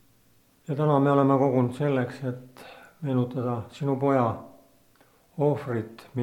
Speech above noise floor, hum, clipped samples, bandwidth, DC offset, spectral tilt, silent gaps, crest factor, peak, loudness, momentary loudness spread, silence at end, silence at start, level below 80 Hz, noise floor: 37 dB; none; under 0.1%; 13 kHz; under 0.1%; -9 dB/octave; none; 20 dB; -6 dBFS; -26 LUFS; 19 LU; 0 s; 0.7 s; -68 dBFS; -62 dBFS